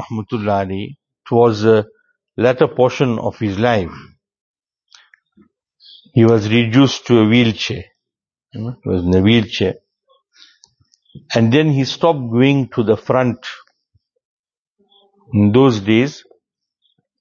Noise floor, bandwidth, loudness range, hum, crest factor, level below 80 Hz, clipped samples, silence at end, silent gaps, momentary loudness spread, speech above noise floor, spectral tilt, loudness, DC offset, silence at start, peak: -85 dBFS; 7.2 kHz; 4 LU; none; 16 dB; -50 dBFS; under 0.1%; 1 s; 4.41-4.54 s, 14.25-14.44 s, 14.57-14.76 s; 16 LU; 70 dB; -7 dB/octave; -15 LUFS; under 0.1%; 0 s; 0 dBFS